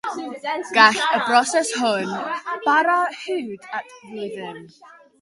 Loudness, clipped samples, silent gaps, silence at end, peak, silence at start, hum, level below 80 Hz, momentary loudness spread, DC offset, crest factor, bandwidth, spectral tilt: -20 LUFS; under 0.1%; none; 0.3 s; 0 dBFS; 0.05 s; none; -74 dBFS; 18 LU; under 0.1%; 20 dB; 11.5 kHz; -2 dB/octave